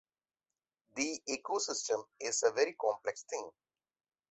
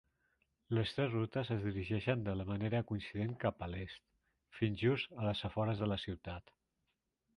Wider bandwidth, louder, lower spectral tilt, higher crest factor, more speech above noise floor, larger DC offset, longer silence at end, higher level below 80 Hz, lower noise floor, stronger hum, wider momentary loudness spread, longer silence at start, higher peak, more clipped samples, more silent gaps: second, 8.4 kHz vs 11 kHz; first, -35 LUFS vs -38 LUFS; second, -0.5 dB/octave vs -8 dB/octave; about the same, 22 dB vs 20 dB; first, over 54 dB vs 48 dB; neither; second, 0.8 s vs 1 s; second, -80 dBFS vs -58 dBFS; first, under -90 dBFS vs -85 dBFS; neither; about the same, 11 LU vs 11 LU; first, 0.95 s vs 0.7 s; about the same, -16 dBFS vs -18 dBFS; neither; neither